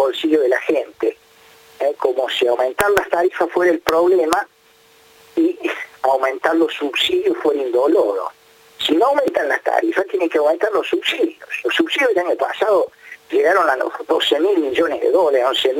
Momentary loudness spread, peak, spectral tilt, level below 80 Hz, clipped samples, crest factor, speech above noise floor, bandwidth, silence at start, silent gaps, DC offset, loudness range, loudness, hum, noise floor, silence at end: 7 LU; 0 dBFS; -3 dB/octave; -58 dBFS; under 0.1%; 18 dB; 35 dB; 17 kHz; 0 s; none; under 0.1%; 2 LU; -18 LUFS; none; -52 dBFS; 0 s